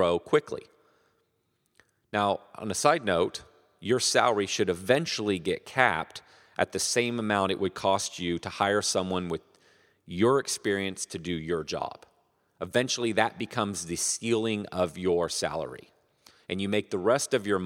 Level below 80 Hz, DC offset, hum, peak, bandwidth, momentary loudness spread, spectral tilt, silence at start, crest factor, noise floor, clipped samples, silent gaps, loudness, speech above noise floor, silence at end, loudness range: -62 dBFS; under 0.1%; none; -4 dBFS; 16.5 kHz; 12 LU; -3.5 dB/octave; 0 s; 24 dB; -75 dBFS; under 0.1%; none; -28 LUFS; 47 dB; 0 s; 4 LU